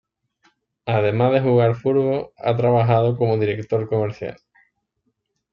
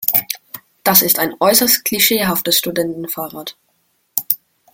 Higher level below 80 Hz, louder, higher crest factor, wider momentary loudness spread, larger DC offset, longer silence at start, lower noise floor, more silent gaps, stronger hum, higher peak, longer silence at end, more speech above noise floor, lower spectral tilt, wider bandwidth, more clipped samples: about the same, -58 dBFS vs -56 dBFS; second, -19 LUFS vs -14 LUFS; about the same, 16 dB vs 18 dB; second, 8 LU vs 16 LU; neither; first, 0.85 s vs 0 s; first, -73 dBFS vs -63 dBFS; neither; neither; second, -4 dBFS vs 0 dBFS; first, 1.2 s vs 0.4 s; first, 54 dB vs 48 dB; first, -9.5 dB/octave vs -2 dB/octave; second, 5.6 kHz vs over 20 kHz; neither